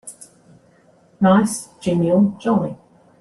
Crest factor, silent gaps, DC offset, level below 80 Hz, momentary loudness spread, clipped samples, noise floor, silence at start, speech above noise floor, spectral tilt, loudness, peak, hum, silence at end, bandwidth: 18 dB; none; under 0.1%; -56 dBFS; 15 LU; under 0.1%; -54 dBFS; 0.05 s; 37 dB; -6.5 dB/octave; -18 LUFS; -2 dBFS; none; 0.45 s; 12.5 kHz